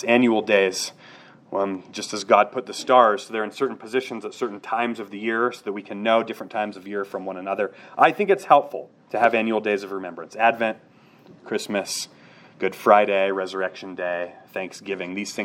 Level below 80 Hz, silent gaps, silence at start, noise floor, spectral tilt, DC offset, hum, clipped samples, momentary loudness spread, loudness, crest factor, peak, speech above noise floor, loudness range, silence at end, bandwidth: -80 dBFS; none; 0 s; -48 dBFS; -4 dB/octave; under 0.1%; none; under 0.1%; 14 LU; -23 LUFS; 22 dB; 0 dBFS; 25 dB; 5 LU; 0 s; 16.5 kHz